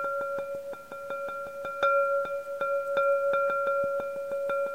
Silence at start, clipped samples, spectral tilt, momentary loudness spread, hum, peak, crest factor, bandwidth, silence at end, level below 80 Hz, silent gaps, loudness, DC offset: 0 s; under 0.1%; -4 dB/octave; 11 LU; none; -12 dBFS; 18 dB; 16 kHz; 0 s; -70 dBFS; none; -29 LUFS; 0.2%